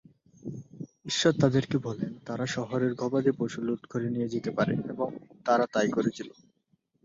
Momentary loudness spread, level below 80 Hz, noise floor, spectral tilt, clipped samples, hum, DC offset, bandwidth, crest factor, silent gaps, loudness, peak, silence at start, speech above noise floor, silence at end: 17 LU; -64 dBFS; -72 dBFS; -5.5 dB/octave; under 0.1%; none; under 0.1%; 7.8 kHz; 20 dB; none; -29 LUFS; -8 dBFS; 0.45 s; 44 dB; 0.75 s